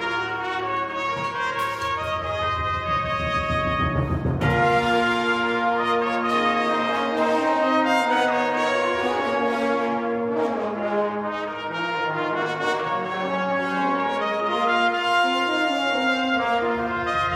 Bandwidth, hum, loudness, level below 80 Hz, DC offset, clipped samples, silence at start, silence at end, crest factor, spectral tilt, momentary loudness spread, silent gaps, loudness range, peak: 15.5 kHz; none; -23 LUFS; -46 dBFS; under 0.1%; under 0.1%; 0 s; 0 s; 14 dB; -5.5 dB/octave; 5 LU; none; 4 LU; -8 dBFS